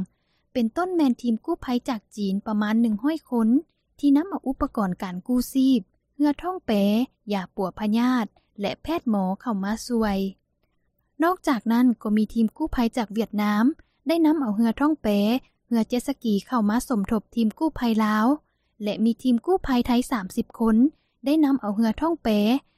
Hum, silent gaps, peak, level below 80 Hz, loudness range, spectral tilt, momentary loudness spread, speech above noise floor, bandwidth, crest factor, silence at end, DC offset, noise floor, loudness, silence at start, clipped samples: none; none; -10 dBFS; -48 dBFS; 3 LU; -6.5 dB/octave; 7 LU; 48 dB; 15 kHz; 14 dB; 0.2 s; under 0.1%; -70 dBFS; -24 LUFS; 0 s; under 0.1%